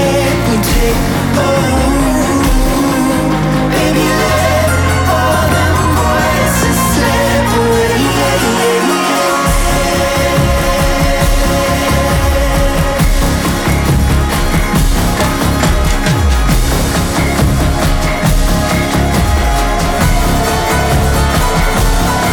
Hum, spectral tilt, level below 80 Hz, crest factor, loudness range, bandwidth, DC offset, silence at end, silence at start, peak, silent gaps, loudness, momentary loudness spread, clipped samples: none; -5 dB/octave; -16 dBFS; 8 dB; 1 LU; 19.5 kHz; under 0.1%; 0 s; 0 s; -2 dBFS; none; -12 LUFS; 2 LU; under 0.1%